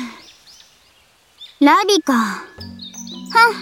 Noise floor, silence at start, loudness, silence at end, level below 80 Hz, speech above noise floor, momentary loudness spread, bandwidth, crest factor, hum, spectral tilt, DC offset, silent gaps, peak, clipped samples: -54 dBFS; 0 s; -15 LUFS; 0 s; -62 dBFS; 39 dB; 20 LU; 17 kHz; 18 dB; none; -3 dB/octave; under 0.1%; none; 0 dBFS; under 0.1%